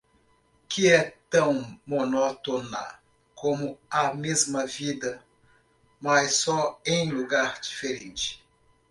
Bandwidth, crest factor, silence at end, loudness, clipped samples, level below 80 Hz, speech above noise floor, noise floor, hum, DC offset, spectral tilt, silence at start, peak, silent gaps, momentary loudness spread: 11.5 kHz; 20 dB; 0.55 s; -26 LUFS; under 0.1%; -62 dBFS; 39 dB; -64 dBFS; none; under 0.1%; -3 dB/octave; 0.7 s; -6 dBFS; none; 12 LU